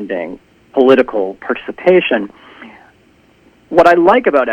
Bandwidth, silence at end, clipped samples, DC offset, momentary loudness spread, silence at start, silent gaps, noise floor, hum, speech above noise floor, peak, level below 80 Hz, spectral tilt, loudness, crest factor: 8.8 kHz; 0 s; 0.3%; under 0.1%; 13 LU; 0 s; none; -50 dBFS; none; 38 dB; 0 dBFS; -50 dBFS; -6.5 dB/octave; -12 LUFS; 14 dB